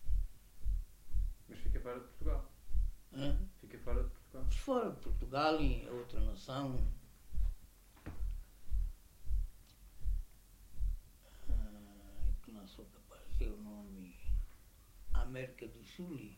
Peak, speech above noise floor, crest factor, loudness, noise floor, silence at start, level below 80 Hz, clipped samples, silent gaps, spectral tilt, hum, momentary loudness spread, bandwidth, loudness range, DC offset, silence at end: -20 dBFS; 22 dB; 18 dB; -43 LUFS; -59 dBFS; 0 s; -40 dBFS; under 0.1%; none; -6.5 dB/octave; none; 19 LU; 15.5 kHz; 8 LU; under 0.1%; 0 s